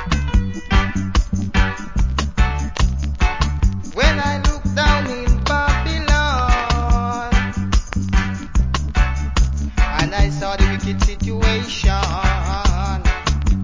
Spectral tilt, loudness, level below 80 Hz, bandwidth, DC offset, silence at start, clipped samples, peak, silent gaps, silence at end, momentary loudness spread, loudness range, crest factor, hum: -5 dB/octave; -19 LUFS; -18 dBFS; 7.6 kHz; under 0.1%; 0 s; under 0.1%; -2 dBFS; none; 0 s; 4 LU; 2 LU; 16 dB; none